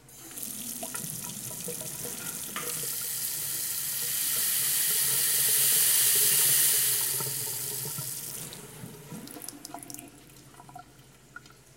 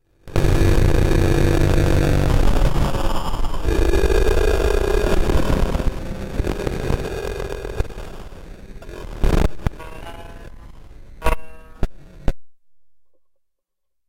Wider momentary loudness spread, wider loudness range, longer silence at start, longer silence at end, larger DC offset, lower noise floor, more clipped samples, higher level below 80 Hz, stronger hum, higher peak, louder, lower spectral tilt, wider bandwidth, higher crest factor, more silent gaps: about the same, 21 LU vs 19 LU; first, 17 LU vs 13 LU; second, 0.05 s vs 0.25 s; second, 0.25 s vs 1.2 s; neither; second, -55 dBFS vs -74 dBFS; neither; second, -66 dBFS vs -22 dBFS; neither; second, -10 dBFS vs -2 dBFS; second, -25 LUFS vs -21 LUFS; second, 0 dB/octave vs -6.5 dB/octave; about the same, 17 kHz vs 16 kHz; about the same, 20 dB vs 16 dB; neither